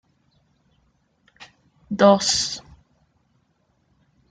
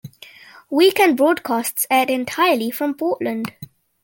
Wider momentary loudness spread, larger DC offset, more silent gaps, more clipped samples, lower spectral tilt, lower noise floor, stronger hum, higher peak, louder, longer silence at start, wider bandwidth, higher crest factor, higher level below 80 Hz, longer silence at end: first, 18 LU vs 10 LU; neither; neither; neither; about the same, -3.5 dB/octave vs -3 dB/octave; first, -67 dBFS vs -44 dBFS; neither; about the same, -4 dBFS vs -2 dBFS; about the same, -19 LUFS vs -18 LUFS; first, 1.4 s vs 0.05 s; second, 9.6 kHz vs 17 kHz; about the same, 22 dB vs 18 dB; first, -58 dBFS vs -66 dBFS; first, 1.7 s vs 0.4 s